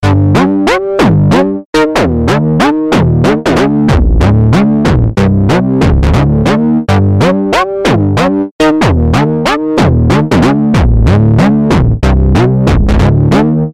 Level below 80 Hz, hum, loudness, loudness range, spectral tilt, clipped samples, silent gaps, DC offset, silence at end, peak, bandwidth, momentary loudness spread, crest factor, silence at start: -16 dBFS; none; -9 LUFS; 1 LU; -7.5 dB/octave; under 0.1%; 1.65-1.73 s, 8.51-8.59 s; under 0.1%; 0 s; 0 dBFS; 13 kHz; 3 LU; 8 dB; 0 s